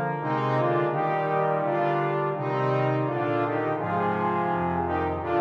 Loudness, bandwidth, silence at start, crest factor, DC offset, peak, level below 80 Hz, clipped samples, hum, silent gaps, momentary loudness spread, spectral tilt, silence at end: -26 LUFS; 6.8 kHz; 0 s; 12 dB; under 0.1%; -12 dBFS; -56 dBFS; under 0.1%; none; none; 3 LU; -9 dB/octave; 0 s